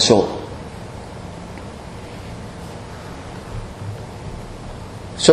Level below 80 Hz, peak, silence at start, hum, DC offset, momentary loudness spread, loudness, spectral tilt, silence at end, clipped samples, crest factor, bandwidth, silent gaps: -40 dBFS; 0 dBFS; 0 s; none; under 0.1%; 13 LU; -27 LUFS; -4 dB/octave; 0 s; under 0.1%; 22 dB; 13 kHz; none